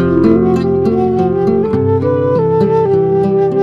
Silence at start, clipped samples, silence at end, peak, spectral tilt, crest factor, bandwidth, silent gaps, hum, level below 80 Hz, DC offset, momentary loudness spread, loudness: 0 s; under 0.1%; 0 s; 0 dBFS; -10 dB/octave; 12 dB; 7 kHz; none; none; -40 dBFS; under 0.1%; 3 LU; -12 LUFS